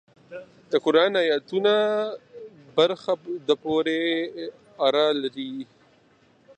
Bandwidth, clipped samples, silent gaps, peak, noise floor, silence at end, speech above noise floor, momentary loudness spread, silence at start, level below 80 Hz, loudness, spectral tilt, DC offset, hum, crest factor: 9 kHz; under 0.1%; none; -6 dBFS; -59 dBFS; 0.95 s; 36 dB; 22 LU; 0.3 s; -72 dBFS; -24 LUFS; -5 dB/octave; under 0.1%; none; 18 dB